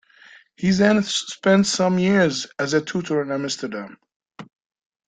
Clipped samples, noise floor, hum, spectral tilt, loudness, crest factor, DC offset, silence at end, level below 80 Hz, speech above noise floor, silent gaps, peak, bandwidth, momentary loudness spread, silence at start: under 0.1%; -50 dBFS; none; -4.5 dB/octave; -20 LUFS; 20 dB; under 0.1%; 0.65 s; -58 dBFS; 30 dB; 4.16-4.20 s; -2 dBFS; 9.4 kHz; 10 LU; 0.6 s